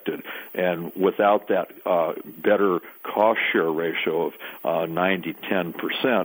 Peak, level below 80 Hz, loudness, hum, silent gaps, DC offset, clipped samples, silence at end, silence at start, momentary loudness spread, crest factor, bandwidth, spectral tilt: -6 dBFS; -70 dBFS; -24 LUFS; none; none; under 0.1%; under 0.1%; 0 s; 0.05 s; 8 LU; 18 dB; 18.5 kHz; -7 dB/octave